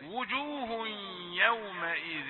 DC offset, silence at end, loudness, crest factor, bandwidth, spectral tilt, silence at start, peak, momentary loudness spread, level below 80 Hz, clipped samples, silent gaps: under 0.1%; 0 s; -32 LUFS; 22 dB; 4.3 kHz; 0 dB/octave; 0 s; -12 dBFS; 10 LU; -70 dBFS; under 0.1%; none